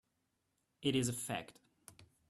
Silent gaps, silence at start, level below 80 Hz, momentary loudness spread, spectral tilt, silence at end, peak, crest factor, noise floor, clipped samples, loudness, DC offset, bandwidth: none; 0.8 s; -72 dBFS; 10 LU; -4 dB/octave; 0.25 s; -22 dBFS; 22 dB; -83 dBFS; under 0.1%; -38 LUFS; under 0.1%; 14 kHz